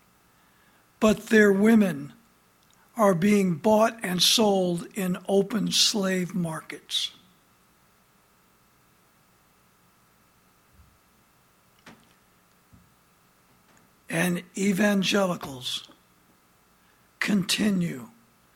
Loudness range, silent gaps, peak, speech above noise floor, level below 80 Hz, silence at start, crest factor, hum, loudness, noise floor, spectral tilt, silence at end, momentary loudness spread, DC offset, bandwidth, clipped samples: 12 LU; none; -6 dBFS; 38 dB; -64 dBFS; 1 s; 22 dB; none; -24 LUFS; -62 dBFS; -4 dB/octave; 0.5 s; 13 LU; under 0.1%; 16.5 kHz; under 0.1%